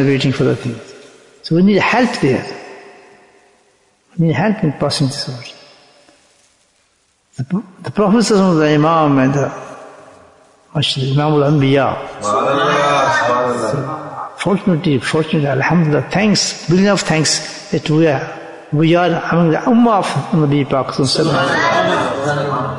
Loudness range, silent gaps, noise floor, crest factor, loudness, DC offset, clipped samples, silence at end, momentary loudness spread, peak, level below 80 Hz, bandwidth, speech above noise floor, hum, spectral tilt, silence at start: 6 LU; none; -59 dBFS; 14 dB; -15 LUFS; under 0.1%; under 0.1%; 0 s; 13 LU; -2 dBFS; -50 dBFS; 11 kHz; 45 dB; none; -5.5 dB/octave; 0 s